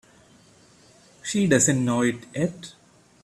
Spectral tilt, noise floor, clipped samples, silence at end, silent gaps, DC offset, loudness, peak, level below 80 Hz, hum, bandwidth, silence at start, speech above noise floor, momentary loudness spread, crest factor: -4.5 dB/octave; -55 dBFS; under 0.1%; 0.55 s; none; under 0.1%; -23 LUFS; -6 dBFS; -60 dBFS; none; 14 kHz; 1.25 s; 32 dB; 19 LU; 20 dB